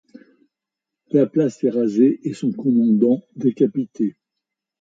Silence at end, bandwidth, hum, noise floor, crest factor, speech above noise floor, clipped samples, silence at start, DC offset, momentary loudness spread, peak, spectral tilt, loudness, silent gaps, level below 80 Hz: 0.7 s; 8 kHz; none; -85 dBFS; 16 dB; 67 dB; under 0.1%; 1.15 s; under 0.1%; 8 LU; -4 dBFS; -9 dB/octave; -19 LUFS; none; -70 dBFS